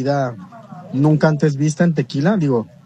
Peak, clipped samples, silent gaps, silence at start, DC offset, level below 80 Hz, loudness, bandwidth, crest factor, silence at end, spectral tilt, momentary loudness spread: -2 dBFS; under 0.1%; none; 0 s; under 0.1%; -60 dBFS; -17 LUFS; 9.6 kHz; 16 dB; 0.2 s; -7.5 dB/octave; 18 LU